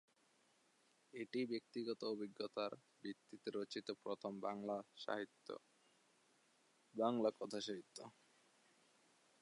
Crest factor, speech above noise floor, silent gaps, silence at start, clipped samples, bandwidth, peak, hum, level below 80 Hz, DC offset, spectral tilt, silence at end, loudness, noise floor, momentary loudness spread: 22 dB; 31 dB; none; 1.15 s; under 0.1%; 11 kHz; -26 dBFS; none; under -90 dBFS; under 0.1%; -5 dB/octave; 1.3 s; -46 LUFS; -77 dBFS; 14 LU